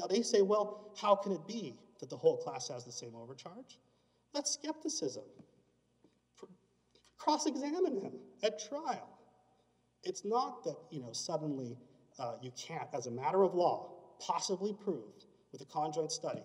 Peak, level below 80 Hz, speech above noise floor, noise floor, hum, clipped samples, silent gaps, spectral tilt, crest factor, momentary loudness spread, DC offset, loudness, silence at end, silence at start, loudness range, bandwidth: -14 dBFS; -88 dBFS; 38 dB; -74 dBFS; 60 Hz at -75 dBFS; under 0.1%; none; -4 dB/octave; 24 dB; 18 LU; under 0.1%; -37 LUFS; 0 s; 0 s; 6 LU; 11 kHz